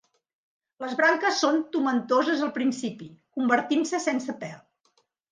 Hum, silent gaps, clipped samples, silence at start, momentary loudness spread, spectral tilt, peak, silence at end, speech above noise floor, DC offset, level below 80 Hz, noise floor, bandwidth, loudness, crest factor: none; none; under 0.1%; 0.8 s; 15 LU; -3.5 dB/octave; -8 dBFS; 0.75 s; 44 dB; under 0.1%; -78 dBFS; -70 dBFS; 9.8 kHz; -25 LUFS; 18 dB